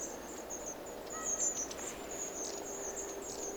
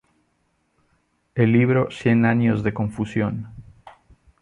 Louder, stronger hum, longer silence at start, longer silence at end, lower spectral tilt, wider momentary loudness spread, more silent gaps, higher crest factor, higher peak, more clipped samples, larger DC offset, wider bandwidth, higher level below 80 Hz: second, -39 LUFS vs -21 LUFS; neither; second, 0 s vs 1.35 s; second, 0 s vs 0.5 s; second, -1.5 dB/octave vs -8.5 dB/octave; about the same, 10 LU vs 12 LU; neither; about the same, 18 dB vs 18 dB; second, -22 dBFS vs -4 dBFS; neither; neither; first, over 20 kHz vs 9.6 kHz; second, -62 dBFS vs -52 dBFS